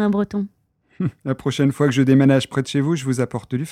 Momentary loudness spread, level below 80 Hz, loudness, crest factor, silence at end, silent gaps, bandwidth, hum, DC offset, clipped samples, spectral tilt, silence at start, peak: 12 LU; -56 dBFS; -20 LUFS; 16 dB; 0 s; none; 13.5 kHz; none; under 0.1%; under 0.1%; -6.5 dB/octave; 0 s; -4 dBFS